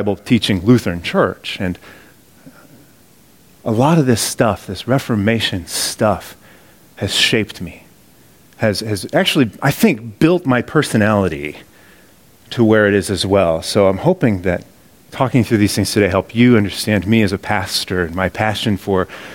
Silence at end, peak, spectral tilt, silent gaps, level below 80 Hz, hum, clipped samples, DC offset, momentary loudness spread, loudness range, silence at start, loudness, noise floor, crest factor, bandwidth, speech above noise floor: 0 s; 0 dBFS; -5 dB/octave; none; -46 dBFS; none; under 0.1%; 0.1%; 10 LU; 4 LU; 0 s; -16 LUFS; -49 dBFS; 16 dB; 17 kHz; 33 dB